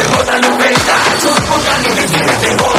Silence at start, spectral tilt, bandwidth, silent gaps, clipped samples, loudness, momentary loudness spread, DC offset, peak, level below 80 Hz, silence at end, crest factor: 0 s; -3 dB/octave; 16 kHz; none; under 0.1%; -10 LUFS; 2 LU; under 0.1%; 0 dBFS; -36 dBFS; 0 s; 10 dB